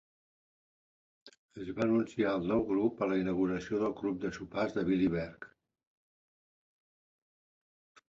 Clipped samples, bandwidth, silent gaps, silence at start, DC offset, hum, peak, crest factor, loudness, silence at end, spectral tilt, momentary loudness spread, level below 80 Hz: under 0.1%; 7.6 kHz; 1.39-1.49 s; 1.25 s; under 0.1%; none; -18 dBFS; 18 dB; -33 LUFS; 2.65 s; -7.5 dB/octave; 13 LU; -62 dBFS